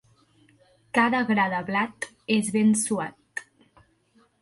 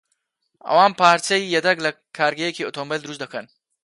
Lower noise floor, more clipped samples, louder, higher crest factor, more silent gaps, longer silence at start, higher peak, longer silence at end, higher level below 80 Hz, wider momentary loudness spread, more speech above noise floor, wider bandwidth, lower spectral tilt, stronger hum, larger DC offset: second, -63 dBFS vs -73 dBFS; neither; second, -24 LUFS vs -19 LUFS; about the same, 18 dB vs 20 dB; neither; first, 0.95 s vs 0.65 s; second, -8 dBFS vs 0 dBFS; first, 1 s vs 0.4 s; about the same, -68 dBFS vs -72 dBFS; about the same, 15 LU vs 16 LU; second, 39 dB vs 53 dB; about the same, 11.5 kHz vs 11.5 kHz; about the same, -4 dB/octave vs -3 dB/octave; neither; neither